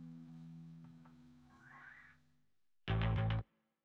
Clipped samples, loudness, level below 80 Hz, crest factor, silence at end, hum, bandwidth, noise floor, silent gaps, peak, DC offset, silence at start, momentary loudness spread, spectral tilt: under 0.1%; -39 LUFS; -52 dBFS; 20 dB; 0.4 s; none; 5.2 kHz; -85 dBFS; none; -24 dBFS; under 0.1%; 0 s; 26 LU; -8.5 dB/octave